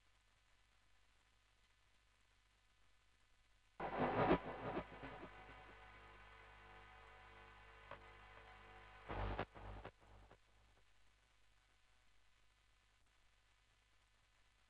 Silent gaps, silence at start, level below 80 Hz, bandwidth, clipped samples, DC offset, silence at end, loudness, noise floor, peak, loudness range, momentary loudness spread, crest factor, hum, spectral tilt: none; 3.8 s; -64 dBFS; 10 kHz; under 0.1%; under 0.1%; 4.35 s; -45 LUFS; -76 dBFS; -22 dBFS; 16 LU; 22 LU; 30 dB; none; -7.5 dB/octave